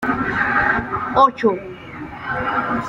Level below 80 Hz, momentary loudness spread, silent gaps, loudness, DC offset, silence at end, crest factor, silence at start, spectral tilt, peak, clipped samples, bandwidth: -44 dBFS; 16 LU; none; -18 LUFS; under 0.1%; 0 s; 18 dB; 0 s; -6.5 dB/octave; -2 dBFS; under 0.1%; 10.5 kHz